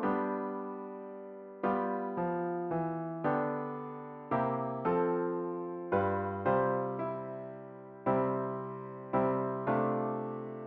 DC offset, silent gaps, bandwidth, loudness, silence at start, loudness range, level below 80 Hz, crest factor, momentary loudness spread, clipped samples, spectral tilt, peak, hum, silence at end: under 0.1%; none; 4.6 kHz; -34 LUFS; 0 s; 2 LU; -70 dBFS; 18 dB; 13 LU; under 0.1%; -8 dB/octave; -16 dBFS; none; 0 s